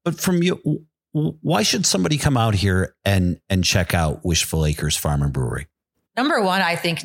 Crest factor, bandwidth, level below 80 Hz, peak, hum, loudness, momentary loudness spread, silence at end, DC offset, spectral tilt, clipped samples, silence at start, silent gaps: 18 dB; 17 kHz; -36 dBFS; -2 dBFS; none; -20 LUFS; 7 LU; 0 s; under 0.1%; -4.5 dB/octave; under 0.1%; 0.05 s; none